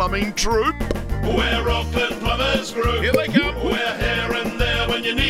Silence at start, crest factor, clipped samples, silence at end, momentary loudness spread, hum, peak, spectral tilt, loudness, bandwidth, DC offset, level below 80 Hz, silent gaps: 0 s; 18 dB; under 0.1%; 0 s; 3 LU; none; -2 dBFS; -4.5 dB/octave; -20 LUFS; 16 kHz; under 0.1%; -28 dBFS; none